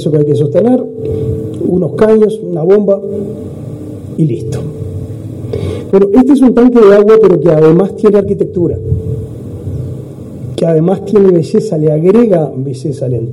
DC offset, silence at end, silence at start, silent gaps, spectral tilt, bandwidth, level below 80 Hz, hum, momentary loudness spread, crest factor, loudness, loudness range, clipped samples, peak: under 0.1%; 0 s; 0 s; none; -9 dB/octave; 11.5 kHz; -40 dBFS; none; 17 LU; 10 dB; -10 LUFS; 7 LU; 1%; 0 dBFS